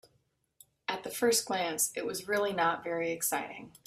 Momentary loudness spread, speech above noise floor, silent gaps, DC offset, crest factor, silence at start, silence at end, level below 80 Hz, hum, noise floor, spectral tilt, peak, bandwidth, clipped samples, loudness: 9 LU; 42 dB; none; under 0.1%; 16 dB; 0.9 s; 0.2 s; -72 dBFS; none; -74 dBFS; -2 dB/octave; -16 dBFS; 16 kHz; under 0.1%; -31 LUFS